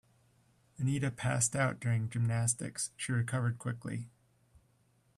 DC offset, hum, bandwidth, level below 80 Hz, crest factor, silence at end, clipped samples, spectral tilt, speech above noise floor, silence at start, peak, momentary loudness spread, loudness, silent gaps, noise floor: under 0.1%; none; 13 kHz; -66 dBFS; 20 dB; 1.1 s; under 0.1%; -4.5 dB/octave; 37 dB; 0.8 s; -14 dBFS; 9 LU; -34 LUFS; none; -71 dBFS